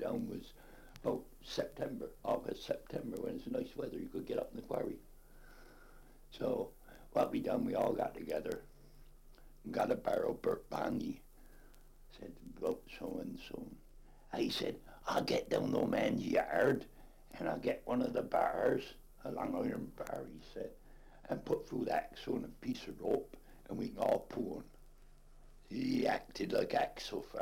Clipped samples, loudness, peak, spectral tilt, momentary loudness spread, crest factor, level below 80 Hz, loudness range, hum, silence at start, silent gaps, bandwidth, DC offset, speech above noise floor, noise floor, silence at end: under 0.1%; -39 LUFS; -18 dBFS; -6 dB/octave; 15 LU; 20 dB; -58 dBFS; 7 LU; none; 0 s; none; 16.5 kHz; under 0.1%; 21 dB; -58 dBFS; 0 s